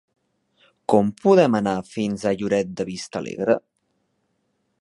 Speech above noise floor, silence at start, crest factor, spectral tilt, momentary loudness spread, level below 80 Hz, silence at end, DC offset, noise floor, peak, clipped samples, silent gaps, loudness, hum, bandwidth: 51 dB; 0.9 s; 20 dB; -6.5 dB/octave; 13 LU; -60 dBFS; 1.2 s; under 0.1%; -71 dBFS; -2 dBFS; under 0.1%; none; -22 LUFS; none; 11.5 kHz